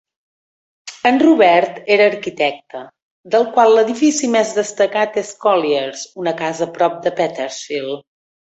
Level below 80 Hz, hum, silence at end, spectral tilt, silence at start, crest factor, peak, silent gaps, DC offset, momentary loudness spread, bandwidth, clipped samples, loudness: -64 dBFS; none; 0.55 s; -3.5 dB/octave; 0.85 s; 16 dB; -2 dBFS; 3.02-3.24 s; under 0.1%; 14 LU; 8.2 kHz; under 0.1%; -16 LUFS